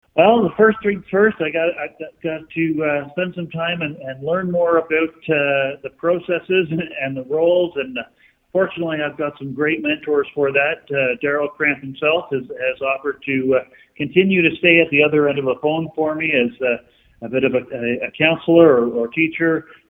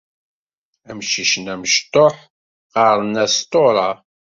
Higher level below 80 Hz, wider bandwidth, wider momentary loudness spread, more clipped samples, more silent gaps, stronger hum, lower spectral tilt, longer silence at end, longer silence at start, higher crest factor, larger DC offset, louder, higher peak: about the same, -58 dBFS vs -60 dBFS; first, 16 kHz vs 7.8 kHz; about the same, 11 LU vs 10 LU; neither; second, none vs 2.30-2.70 s; neither; first, -9 dB/octave vs -2.5 dB/octave; about the same, 0.25 s vs 0.35 s; second, 0.15 s vs 0.9 s; about the same, 18 dB vs 16 dB; neither; about the same, -18 LUFS vs -16 LUFS; about the same, 0 dBFS vs -2 dBFS